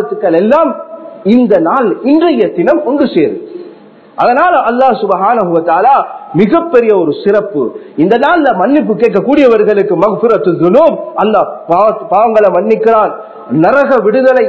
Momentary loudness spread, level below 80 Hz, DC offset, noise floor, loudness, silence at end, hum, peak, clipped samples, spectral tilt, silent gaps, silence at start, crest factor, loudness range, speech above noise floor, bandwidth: 8 LU; -52 dBFS; under 0.1%; -36 dBFS; -9 LUFS; 0 s; none; 0 dBFS; 0.9%; -8.5 dB/octave; none; 0 s; 10 dB; 2 LU; 27 dB; 7.2 kHz